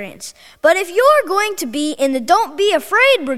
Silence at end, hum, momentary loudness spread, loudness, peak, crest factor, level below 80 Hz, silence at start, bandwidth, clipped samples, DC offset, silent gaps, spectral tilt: 0 s; none; 10 LU; -15 LUFS; 0 dBFS; 16 dB; -60 dBFS; 0 s; 16 kHz; under 0.1%; 0.8%; none; -1.5 dB/octave